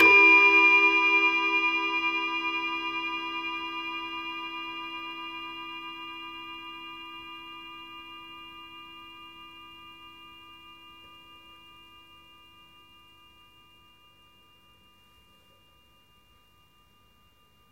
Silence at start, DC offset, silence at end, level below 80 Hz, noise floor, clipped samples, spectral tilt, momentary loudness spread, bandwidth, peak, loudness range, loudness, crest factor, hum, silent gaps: 0 s; under 0.1%; 7 s; -68 dBFS; -63 dBFS; under 0.1%; -2.5 dB/octave; 29 LU; 15.5 kHz; -8 dBFS; 26 LU; -23 LUFS; 20 dB; none; none